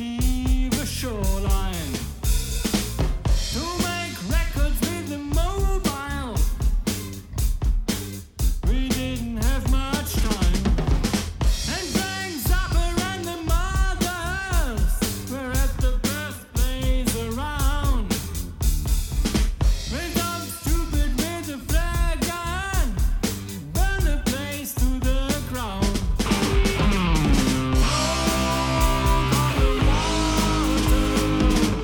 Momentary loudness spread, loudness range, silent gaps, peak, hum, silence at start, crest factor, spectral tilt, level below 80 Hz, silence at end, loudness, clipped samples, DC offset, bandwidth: 7 LU; 5 LU; none; -8 dBFS; none; 0 s; 14 dB; -4.5 dB/octave; -24 dBFS; 0 s; -24 LUFS; under 0.1%; under 0.1%; 19 kHz